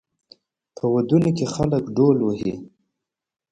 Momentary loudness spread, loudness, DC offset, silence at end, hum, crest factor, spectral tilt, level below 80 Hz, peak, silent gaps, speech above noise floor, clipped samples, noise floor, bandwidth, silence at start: 9 LU; -21 LUFS; under 0.1%; 0.85 s; none; 18 dB; -8 dB/octave; -52 dBFS; -6 dBFS; none; 67 dB; under 0.1%; -87 dBFS; 9.4 kHz; 0.85 s